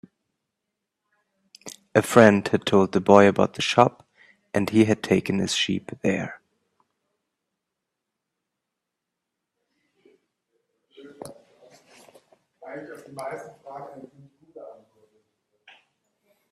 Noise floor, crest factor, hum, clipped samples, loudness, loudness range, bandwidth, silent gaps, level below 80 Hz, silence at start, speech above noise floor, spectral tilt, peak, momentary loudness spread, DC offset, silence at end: -84 dBFS; 26 dB; none; under 0.1%; -20 LUFS; 22 LU; 14 kHz; none; -64 dBFS; 1.65 s; 64 dB; -5.5 dB/octave; 0 dBFS; 26 LU; under 0.1%; 1.8 s